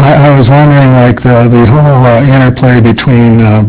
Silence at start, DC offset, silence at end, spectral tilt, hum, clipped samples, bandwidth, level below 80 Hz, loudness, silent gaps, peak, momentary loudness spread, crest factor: 0 s; under 0.1%; 0 s; -12 dB/octave; none; 10%; 4 kHz; -26 dBFS; -4 LUFS; none; 0 dBFS; 2 LU; 4 dB